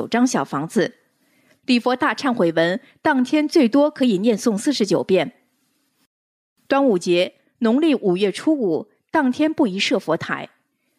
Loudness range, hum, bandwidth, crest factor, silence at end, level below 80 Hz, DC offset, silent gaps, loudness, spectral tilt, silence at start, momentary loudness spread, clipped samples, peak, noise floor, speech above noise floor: 3 LU; none; 13 kHz; 14 dB; 0.5 s; -70 dBFS; under 0.1%; 6.06-6.56 s; -20 LUFS; -5 dB/octave; 0 s; 6 LU; under 0.1%; -6 dBFS; -67 dBFS; 48 dB